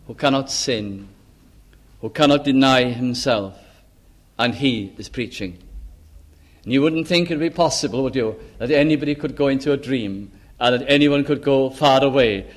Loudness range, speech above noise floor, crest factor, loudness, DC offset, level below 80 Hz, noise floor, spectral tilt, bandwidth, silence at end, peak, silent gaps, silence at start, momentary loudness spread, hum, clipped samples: 6 LU; 33 dB; 18 dB; -19 LUFS; under 0.1%; -46 dBFS; -52 dBFS; -5 dB/octave; 13 kHz; 0.05 s; -2 dBFS; none; 0.1 s; 15 LU; none; under 0.1%